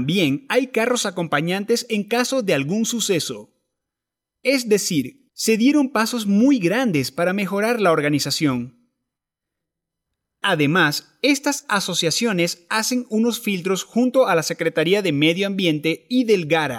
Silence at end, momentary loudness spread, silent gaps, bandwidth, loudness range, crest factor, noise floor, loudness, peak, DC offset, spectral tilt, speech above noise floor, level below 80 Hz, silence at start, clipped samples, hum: 0 s; 6 LU; none; 17 kHz; 4 LU; 14 dB; -85 dBFS; -20 LUFS; -6 dBFS; under 0.1%; -4 dB/octave; 65 dB; -68 dBFS; 0 s; under 0.1%; none